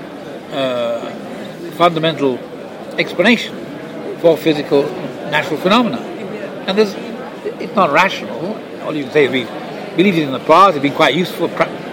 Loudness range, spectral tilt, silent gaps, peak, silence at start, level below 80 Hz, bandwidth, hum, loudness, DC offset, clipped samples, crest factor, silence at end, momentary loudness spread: 3 LU; -5.5 dB/octave; none; 0 dBFS; 0 s; -60 dBFS; 17 kHz; none; -16 LUFS; under 0.1%; under 0.1%; 16 dB; 0 s; 15 LU